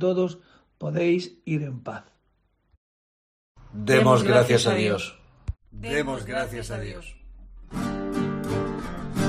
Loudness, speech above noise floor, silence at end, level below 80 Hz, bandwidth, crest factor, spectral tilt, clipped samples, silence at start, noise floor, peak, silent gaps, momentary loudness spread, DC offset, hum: -24 LUFS; 45 dB; 0 s; -46 dBFS; 13.5 kHz; 20 dB; -5.5 dB/octave; under 0.1%; 0 s; -69 dBFS; -4 dBFS; 2.77-3.55 s; 20 LU; under 0.1%; none